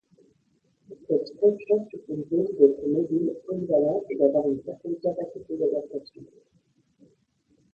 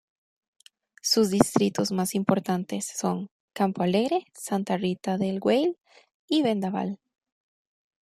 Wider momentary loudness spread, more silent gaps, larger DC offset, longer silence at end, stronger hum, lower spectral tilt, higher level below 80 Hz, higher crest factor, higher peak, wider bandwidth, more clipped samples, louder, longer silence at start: first, 14 LU vs 9 LU; second, none vs 3.31-3.48 s, 6.14-6.28 s; neither; first, 1.5 s vs 1.1 s; neither; first, -9.5 dB/octave vs -5 dB/octave; second, -70 dBFS vs -64 dBFS; about the same, 22 dB vs 24 dB; about the same, -4 dBFS vs -2 dBFS; second, 5.2 kHz vs 15.5 kHz; neither; about the same, -25 LUFS vs -26 LUFS; second, 0.9 s vs 1.05 s